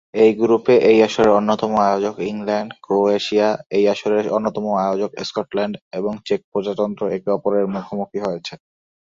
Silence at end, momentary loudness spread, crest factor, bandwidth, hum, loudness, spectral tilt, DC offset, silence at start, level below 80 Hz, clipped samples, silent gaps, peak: 0.6 s; 11 LU; 16 dB; 7.6 kHz; none; -19 LUFS; -6 dB/octave; under 0.1%; 0.15 s; -58 dBFS; under 0.1%; 3.66-3.70 s, 5.82-5.91 s, 6.44-6.52 s; -2 dBFS